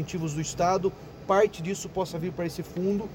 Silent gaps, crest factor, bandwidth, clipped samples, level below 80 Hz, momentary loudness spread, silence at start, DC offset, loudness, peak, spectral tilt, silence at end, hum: none; 16 dB; 17 kHz; under 0.1%; -52 dBFS; 9 LU; 0 s; under 0.1%; -28 LUFS; -12 dBFS; -5.5 dB/octave; 0 s; none